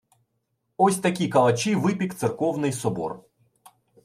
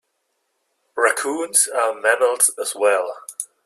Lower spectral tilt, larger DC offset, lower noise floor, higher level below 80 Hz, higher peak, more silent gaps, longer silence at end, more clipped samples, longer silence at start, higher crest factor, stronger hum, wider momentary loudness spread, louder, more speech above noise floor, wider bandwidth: first, -5.5 dB/octave vs 1 dB/octave; neither; about the same, -75 dBFS vs -72 dBFS; first, -66 dBFS vs -80 dBFS; second, -6 dBFS vs -2 dBFS; neither; first, 0.85 s vs 0.2 s; neither; second, 0.8 s vs 0.95 s; about the same, 18 dB vs 20 dB; neither; second, 9 LU vs 13 LU; second, -24 LUFS vs -18 LUFS; about the same, 52 dB vs 52 dB; about the same, 15.5 kHz vs 15 kHz